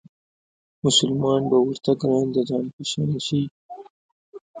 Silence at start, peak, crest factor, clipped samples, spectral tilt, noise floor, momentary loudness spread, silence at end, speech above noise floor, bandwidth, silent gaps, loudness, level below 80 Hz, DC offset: 0.85 s; -6 dBFS; 18 dB; under 0.1%; -5 dB/octave; under -90 dBFS; 12 LU; 0 s; over 69 dB; 9.6 kHz; 2.73-2.78 s, 3.51-3.69 s, 3.90-4.33 s, 4.41-4.54 s; -22 LUFS; -60 dBFS; under 0.1%